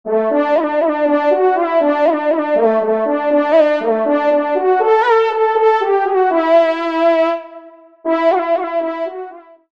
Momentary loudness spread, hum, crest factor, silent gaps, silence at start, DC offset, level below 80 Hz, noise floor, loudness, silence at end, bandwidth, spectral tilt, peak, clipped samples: 7 LU; none; 14 dB; none; 0.05 s; 0.3%; -68 dBFS; -39 dBFS; -14 LUFS; 0.3 s; 7 kHz; -6 dB/octave; -2 dBFS; under 0.1%